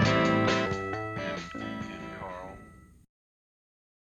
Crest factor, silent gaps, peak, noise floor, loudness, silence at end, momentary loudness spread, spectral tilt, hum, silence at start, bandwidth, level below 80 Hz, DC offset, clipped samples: 18 dB; none; -12 dBFS; -52 dBFS; -30 LUFS; 1.15 s; 17 LU; -5.5 dB/octave; none; 0 s; 9.2 kHz; -54 dBFS; under 0.1%; under 0.1%